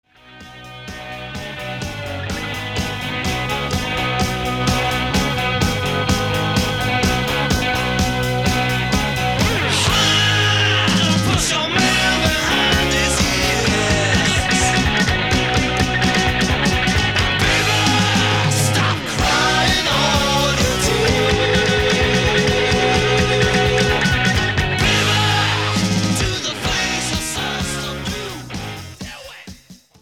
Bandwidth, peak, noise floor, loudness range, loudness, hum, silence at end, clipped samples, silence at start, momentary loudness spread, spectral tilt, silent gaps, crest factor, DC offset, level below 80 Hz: 18.5 kHz; -2 dBFS; -43 dBFS; 6 LU; -16 LUFS; none; 0.25 s; under 0.1%; 0.25 s; 12 LU; -3.5 dB/octave; none; 16 dB; 0.5%; -30 dBFS